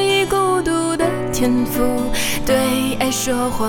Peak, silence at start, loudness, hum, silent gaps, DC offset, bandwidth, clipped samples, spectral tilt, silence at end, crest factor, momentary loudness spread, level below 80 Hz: -4 dBFS; 0 s; -18 LUFS; none; none; under 0.1%; over 20 kHz; under 0.1%; -4 dB/octave; 0 s; 14 dB; 3 LU; -34 dBFS